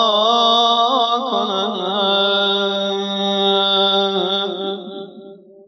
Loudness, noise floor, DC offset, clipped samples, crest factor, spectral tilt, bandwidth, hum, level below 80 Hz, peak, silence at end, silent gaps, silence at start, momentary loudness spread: -16 LUFS; -39 dBFS; under 0.1%; under 0.1%; 16 dB; -4 dB/octave; 6.6 kHz; none; under -90 dBFS; -2 dBFS; 0.3 s; none; 0 s; 12 LU